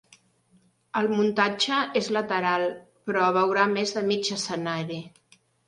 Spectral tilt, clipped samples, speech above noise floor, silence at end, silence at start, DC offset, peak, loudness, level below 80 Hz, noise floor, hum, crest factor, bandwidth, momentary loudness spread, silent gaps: -4 dB/octave; under 0.1%; 38 dB; 0.6 s; 0.95 s; under 0.1%; -6 dBFS; -25 LUFS; -72 dBFS; -63 dBFS; none; 20 dB; 11.5 kHz; 9 LU; none